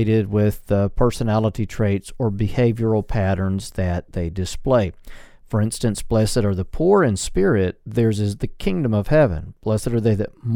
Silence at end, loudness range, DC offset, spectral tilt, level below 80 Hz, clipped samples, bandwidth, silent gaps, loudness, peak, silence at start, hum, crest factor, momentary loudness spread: 0 s; 3 LU; under 0.1%; -7 dB/octave; -34 dBFS; under 0.1%; 15.5 kHz; none; -21 LUFS; -4 dBFS; 0 s; none; 16 dB; 7 LU